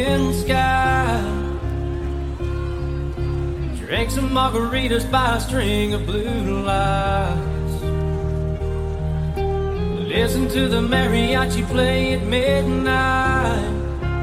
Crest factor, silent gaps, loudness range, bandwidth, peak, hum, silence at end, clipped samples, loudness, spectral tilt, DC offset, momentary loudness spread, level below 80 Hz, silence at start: 16 dB; none; 5 LU; 16 kHz; -4 dBFS; none; 0 s; under 0.1%; -21 LUFS; -6 dB/octave; under 0.1%; 8 LU; -28 dBFS; 0 s